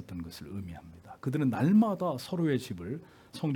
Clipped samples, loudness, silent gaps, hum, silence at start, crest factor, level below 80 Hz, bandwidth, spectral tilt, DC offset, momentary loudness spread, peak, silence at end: under 0.1%; -30 LUFS; none; none; 0 s; 16 dB; -64 dBFS; 17 kHz; -7.5 dB/octave; under 0.1%; 20 LU; -14 dBFS; 0 s